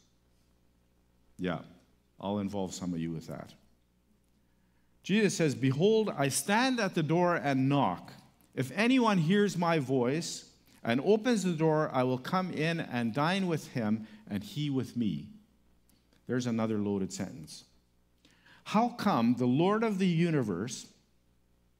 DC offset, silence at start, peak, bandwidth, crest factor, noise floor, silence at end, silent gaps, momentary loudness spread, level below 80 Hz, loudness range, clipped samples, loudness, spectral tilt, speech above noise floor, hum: under 0.1%; 1.4 s; -12 dBFS; 16 kHz; 20 dB; -69 dBFS; 0.95 s; none; 13 LU; -70 dBFS; 10 LU; under 0.1%; -30 LUFS; -5.5 dB/octave; 39 dB; 60 Hz at -60 dBFS